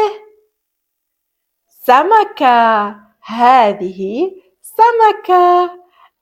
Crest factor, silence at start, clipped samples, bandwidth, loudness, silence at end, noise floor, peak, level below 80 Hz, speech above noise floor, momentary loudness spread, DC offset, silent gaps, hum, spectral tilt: 14 dB; 0 s; 0.1%; 16 kHz; -12 LUFS; 0.45 s; -74 dBFS; 0 dBFS; -62 dBFS; 62 dB; 12 LU; under 0.1%; none; none; -5 dB/octave